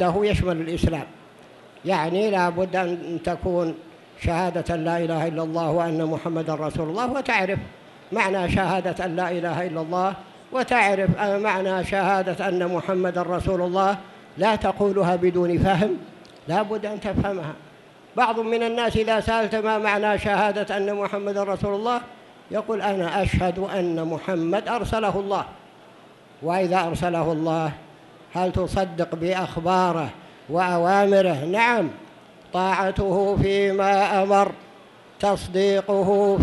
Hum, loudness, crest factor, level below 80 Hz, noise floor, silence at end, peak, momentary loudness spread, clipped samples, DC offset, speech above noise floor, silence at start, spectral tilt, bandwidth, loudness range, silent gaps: none; -23 LUFS; 18 dB; -42 dBFS; -49 dBFS; 0 s; -4 dBFS; 9 LU; under 0.1%; under 0.1%; 27 dB; 0 s; -6.5 dB/octave; 12 kHz; 4 LU; none